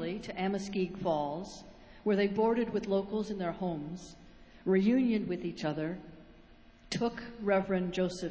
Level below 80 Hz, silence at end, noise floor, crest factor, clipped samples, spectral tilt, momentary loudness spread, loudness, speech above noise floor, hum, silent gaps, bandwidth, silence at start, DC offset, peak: -60 dBFS; 0 s; -57 dBFS; 18 dB; under 0.1%; -6.5 dB/octave; 13 LU; -33 LUFS; 25 dB; none; none; 8 kHz; 0 s; under 0.1%; -16 dBFS